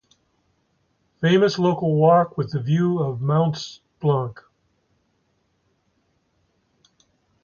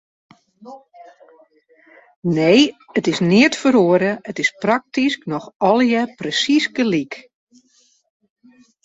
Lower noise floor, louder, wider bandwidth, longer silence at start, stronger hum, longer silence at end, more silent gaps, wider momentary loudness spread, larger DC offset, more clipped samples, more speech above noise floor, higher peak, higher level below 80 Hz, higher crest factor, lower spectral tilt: first, -68 dBFS vs -59 dBFS; second, -21 LUFS vs -17 LUFS; second, 7 kHz vs 8 kHz; first, 1.2 s vs 0.65 s; neither; first, 3.1 s vs 1.65 s; second, none vs 2.16-2.22 s, 5.56-5.60 s; about the same, 10 LU vs 9 LU; neither; neither; first, 49 dB vs 42 dB; about the same, -4 dBFS vs -2 dBFS; about the same, -62 dBFS vs -62 dBFS; about the same, 18 dB vs 18 dB; first, -7.5 dB/octave vs -5 dB/octave